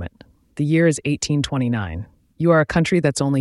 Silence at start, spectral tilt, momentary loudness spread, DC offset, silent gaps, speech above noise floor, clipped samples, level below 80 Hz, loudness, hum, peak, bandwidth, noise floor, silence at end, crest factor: 0 s; -6 dB/octave; 14 LU; under 0.1%; none; 31 dB; under 0.1%; -44 dBFS; -19 LUFS; none; -4 dBFS; 12 kHz; -50 dBFS; 0 s; 16 dB